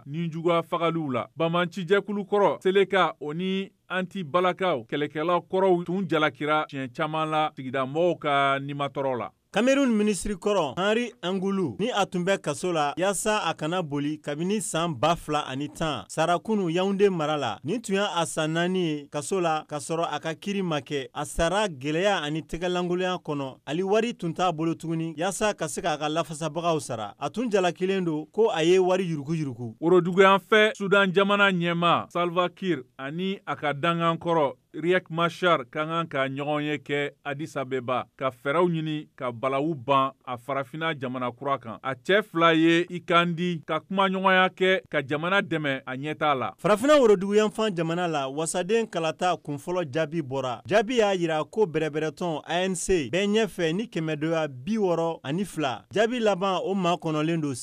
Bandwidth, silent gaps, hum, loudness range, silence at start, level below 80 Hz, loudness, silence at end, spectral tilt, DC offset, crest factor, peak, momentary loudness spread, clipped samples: 15.5 kHz; none; none; 5 LU; 0.05 s; -56 dBFS; -26 LUFS; 0 s; -5 dB/octave; under 0.1%; 20 dB; -6 dBFS; 9 LU; under 0.1%